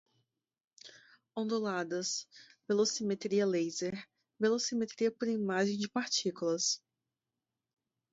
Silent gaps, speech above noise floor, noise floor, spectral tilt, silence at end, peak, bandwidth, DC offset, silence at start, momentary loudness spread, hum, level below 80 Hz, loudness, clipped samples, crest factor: none; 57 dB; -90 dBFS; -3.5 dB/octave; 1.35 s; -18 dBFS; 8 kHz; under 0.1%; 0.85 s; 14 LU; none; -80 dBFS; -33 LUFS; under 0.1%; 16 dB